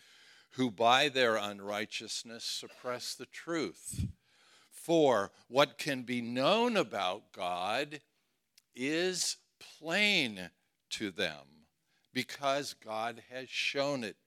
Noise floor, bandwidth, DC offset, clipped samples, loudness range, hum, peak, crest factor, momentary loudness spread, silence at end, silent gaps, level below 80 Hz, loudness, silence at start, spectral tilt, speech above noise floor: -75 dBFS; 16.5 kHz; under 0.1%; under 0.1%; 6 LU; none; -10 dBFS; 24 dB; 14 LU; 0.15 s; none; -66 dBFS; -33 LUFS; 0.55 s; -3 dB/octave; 42 dB